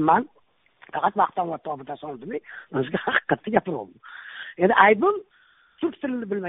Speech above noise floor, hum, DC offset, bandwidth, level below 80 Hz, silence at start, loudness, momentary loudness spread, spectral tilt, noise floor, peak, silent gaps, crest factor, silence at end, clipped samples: 33 dB; none; under 0.1%; 4 kHz; -64 dBFS; 0 s; -24 LUFS; 20 LU; -3.5 dB/octave; -56 dBFS; 0 dBFS; none; 24 dB; 0 s; under 0.1%